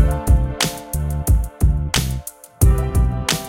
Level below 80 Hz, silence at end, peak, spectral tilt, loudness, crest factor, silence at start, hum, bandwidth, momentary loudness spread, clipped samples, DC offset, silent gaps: -20 dBFS; 0 s; -2 dBFS; -4.5 dB/octave; -19 LUFS; 16 dB; 0 s; none; 17 kHz; 8 LU; under 0.1%; under 0.1%; none